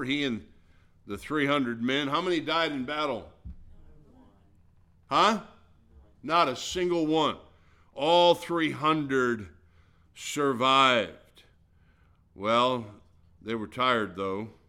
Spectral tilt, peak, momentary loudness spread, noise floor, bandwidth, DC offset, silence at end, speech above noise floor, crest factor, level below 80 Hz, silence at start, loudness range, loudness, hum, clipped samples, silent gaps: -4.5 dB/octave; -8 dBFS; 17 LU; -62 dBFS; 16 kHz; under 0.1%; 0.2 s; 35 dB; 22 dB; -58 dBFS; 0 s; 5 LU; -27 LUFS; none; under 0.1%; none